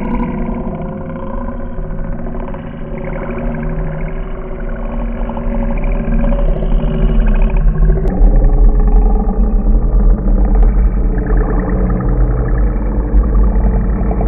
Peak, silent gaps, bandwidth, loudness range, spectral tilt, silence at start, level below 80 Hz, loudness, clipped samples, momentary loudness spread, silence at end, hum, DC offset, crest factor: 0 dBFS; none; 3.1 kHz; 9 LU; -12 dB/octave; 0 s; -12 dBFS; -17 LUFS; under 0.1%; 11 LU; 0 s; none; under 0.1%; 12 dB